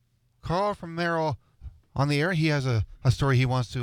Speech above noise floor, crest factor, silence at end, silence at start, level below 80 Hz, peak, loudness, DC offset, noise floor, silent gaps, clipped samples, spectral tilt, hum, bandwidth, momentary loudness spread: 21 dB; 16 dB; 0 s; 0.45 s; -46 dBFS; -10 dBFS; -26 LUFS; under 0.1%; -46 dBFS; none; under 0.1%; -6.5 dB/octave; none; 13.5 kHz; 8 LU